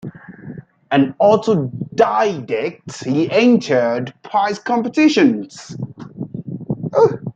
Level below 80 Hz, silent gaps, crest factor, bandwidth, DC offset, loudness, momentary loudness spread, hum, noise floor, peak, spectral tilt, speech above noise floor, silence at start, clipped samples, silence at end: -60 dBFS; none; 16 dB; 8.8 kHz; under 0.1%; -17 LUFS; 18 LU; none; -35 dBFS; -2 dBFS; -6.5 dB/octave; 20 dB; 0.05 s; under 0.1%; 0.05 s